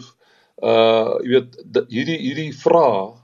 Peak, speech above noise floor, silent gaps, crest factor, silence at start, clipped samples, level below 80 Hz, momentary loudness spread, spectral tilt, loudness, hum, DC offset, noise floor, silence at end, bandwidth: -2 dBFS; 38 dB; none; 16 dB; 0 s; under 0.1%; -72 dBFS; 9 LU; -6.5 dB/octave; -18 LUFS; none; under 0.1%; -56 dBFS; 0.1 s; 7.2 kHz